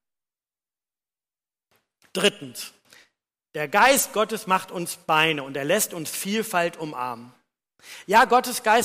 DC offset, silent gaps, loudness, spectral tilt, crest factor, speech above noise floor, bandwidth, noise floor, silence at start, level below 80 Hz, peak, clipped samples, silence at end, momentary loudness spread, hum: under 0.1%; none; -22 LUFS; -2.5 dB/octave; 18 dB; over 67 dB; 15.5 kHz; under -90 dBFS; 2.15 s; -64 dBFS; -6 dBFS; under 0.1%; 0 s; 19 LU; none